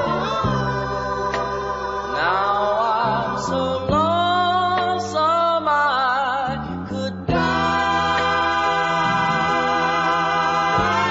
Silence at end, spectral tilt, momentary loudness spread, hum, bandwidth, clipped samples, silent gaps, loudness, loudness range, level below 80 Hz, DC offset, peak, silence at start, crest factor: 0 s; -5 dB/octave; 6 LU; none; 8 kHz; under 0.1%; none; -20 LUFS; 2 LU; -42 dBFS; under 0.1%; -6 dBFS; 0 s; 14 dB